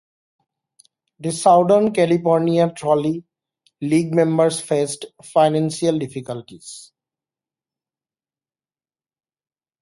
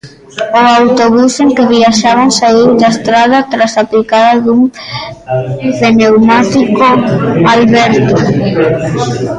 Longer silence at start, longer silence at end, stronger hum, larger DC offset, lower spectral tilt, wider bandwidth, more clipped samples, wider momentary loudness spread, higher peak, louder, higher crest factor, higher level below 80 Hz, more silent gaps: first, 1.2 s vs 0.05 s; first, 3 s vs 0 s; neither; neither; about the same, -6 dB/octave vs -5.5 dB/octave; about the same, 11.5 kHz vs 10.5 kHz; neither; first, 17 LU vs 8 LU; about the same, -2 dBFS vs 0 dBFS; second, -18 LUFS vs -8 LUFS; first, 18 dB vs 8 dB; second, -64 dBFS vs -42 dBFS; neither